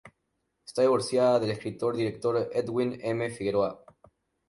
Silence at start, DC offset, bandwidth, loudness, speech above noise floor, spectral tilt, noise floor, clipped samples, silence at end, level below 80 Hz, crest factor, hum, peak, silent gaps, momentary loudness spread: 0.05 s; under 0.1%; 11.5 kHz; -28 LUFS; 51 dB; -6 dB/octave; -78 dBFS; under 0.1%; 0.75 s; -64 dBFS; 16 dB; none; -12 dBFS; none; 7 LU